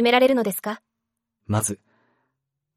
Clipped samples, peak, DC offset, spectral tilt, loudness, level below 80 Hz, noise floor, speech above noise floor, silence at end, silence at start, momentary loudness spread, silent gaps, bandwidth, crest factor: under 0.1%; -4 dBFS; under 0.1%; -4 dB/octave; -22 LUFS; -62 dBFS; -82 dBFS; 61 dB; 1 s; 0 s; 18 LU; none; 16 kHz; 20 dB